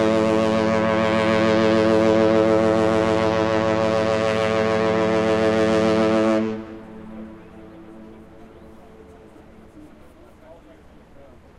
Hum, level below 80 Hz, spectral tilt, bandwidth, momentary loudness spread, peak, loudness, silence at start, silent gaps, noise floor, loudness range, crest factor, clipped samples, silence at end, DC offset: none; -52 dBFS; -6 dB/octave; 11.5 kHz; 15 LU; -4 dBFS; -19 LUFS; 0 s; none; -47 dBFS; 7 LU; 16 dB; under 0.1%; 0.35 s; under 0.1%